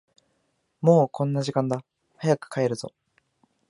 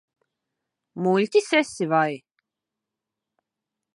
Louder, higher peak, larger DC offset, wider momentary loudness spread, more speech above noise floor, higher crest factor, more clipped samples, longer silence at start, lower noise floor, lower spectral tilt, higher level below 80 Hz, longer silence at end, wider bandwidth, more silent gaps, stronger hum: second, -25 LUFS vs -22 LUFS; about the same, -4 dBFS vs -6 dBFS; neither; about the same, 12 LU vs 13 LU; second, 49 dB vs 64 dB; about the same, 22 dB vs 20 dB; neither; second, 0.8 s vs 0.95 s; second, -72 dBFS vs -86 dBFS; first, -7 dB/octave vs -5 dB/octave; about the same, -72 dBFS vs -76 dBFS; second, 0.8 s vs 1.8 s; about the same, 11 kHz vs 11.5 kHz; neither; neither